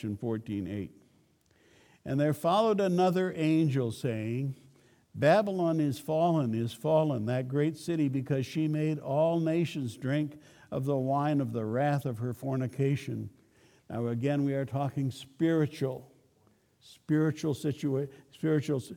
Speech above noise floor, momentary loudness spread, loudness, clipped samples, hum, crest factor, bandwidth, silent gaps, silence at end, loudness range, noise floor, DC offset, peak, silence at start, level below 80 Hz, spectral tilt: 38 dB; 10 LU; -30 LUFS; under 0.1%; none; 18 dB; 17.5 kHz; none; 0 s; 4 LU; -67 dBFS; under 0.1%; -12 dBFS; 0 s; -70 dBFS; -7.5 dB/octave